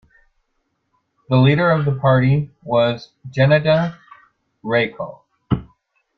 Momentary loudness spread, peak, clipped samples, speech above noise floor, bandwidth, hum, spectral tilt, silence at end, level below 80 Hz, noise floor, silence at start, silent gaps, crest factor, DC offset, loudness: 15 LU; -2 dBFS; under 0.1%; 54 dB; 6 kHz; none; -9 dB/octave; 0.55 s; -48 dBFS; -70 dBFS; 1.3 s; none; 16 dB; under 0.1%; -18 LUFS